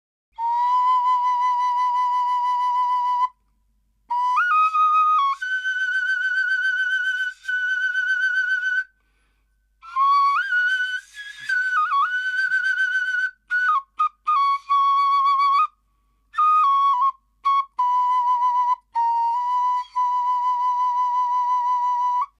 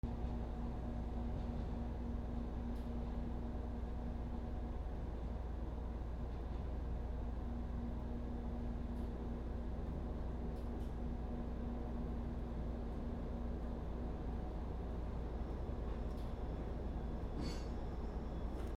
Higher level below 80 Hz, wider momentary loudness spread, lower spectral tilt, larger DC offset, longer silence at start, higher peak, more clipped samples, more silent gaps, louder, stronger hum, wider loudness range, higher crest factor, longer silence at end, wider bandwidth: second, -70 dBFS vs -44 dBFS; first, 7 LU vs 2 LU; second, 3.5 dB/octave vs -8.5 dB/octave; neither; first, 0.4 s vs 0.05 s; first, -12 dBFS vs -28 dBFS; neither; neither; first, -20 LUFS vs -45 LUFS; neither; about the same, 2 LU vs 1 LU; about the same, 10 dB vs 14 dB; first, 0.15 s vs 0 s; first, 11 kHz vs 7.2 kHz